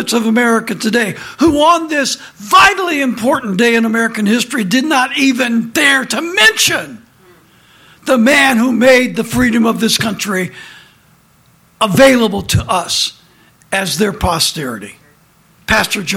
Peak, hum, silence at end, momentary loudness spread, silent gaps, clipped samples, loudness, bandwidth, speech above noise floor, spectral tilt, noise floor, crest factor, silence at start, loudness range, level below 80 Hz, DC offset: 0 dBFS; none; 0 s; 10 LU; none; under 0.1%; -12 LUFS; 17 kHz; 37 dB; -3.5 dB/octave; -50 dBFS; 14 dB; 0 s; 3 LU; -40 dBFS; under 0.1%